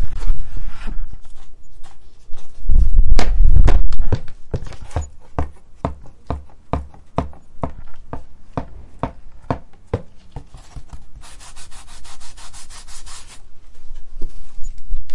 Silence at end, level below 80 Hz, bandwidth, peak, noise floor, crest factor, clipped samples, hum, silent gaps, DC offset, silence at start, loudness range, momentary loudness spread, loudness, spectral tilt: 0 s; -20 dBFS; 8.2 kHz; 0 dBFS; -34 dBFS; 12 dB; under 0.1%; none; none; under 0.1%; 0 s; 18 LU; 22 LU; -25 LUFS; -6.5 dB/octave